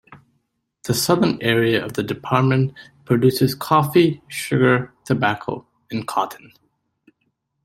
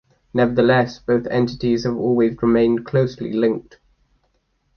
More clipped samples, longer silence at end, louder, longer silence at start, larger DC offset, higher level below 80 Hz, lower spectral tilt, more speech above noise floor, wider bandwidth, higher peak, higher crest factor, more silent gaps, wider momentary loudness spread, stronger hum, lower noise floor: neither; about the same, 1.25 s vs 1.15 s; about the same, -20 LUFS vs -19 LUFS; second, 0.1 s vs 0.35 s; neither; second, -56 dBFS vs -48 dBFS; second, -5.5 dB/octave vs -7.5 dB/octave; first, 52 dB vs 48 dB; first, 16.5 kHz vs 6.6 kHz; about the same, -2 dBFS vs -4 dBFS; about the same, 18 dB vs 16 dB; neither; first, 11 LU vs 5 LU; neither; first, -71 dBFS vs -66 dBFS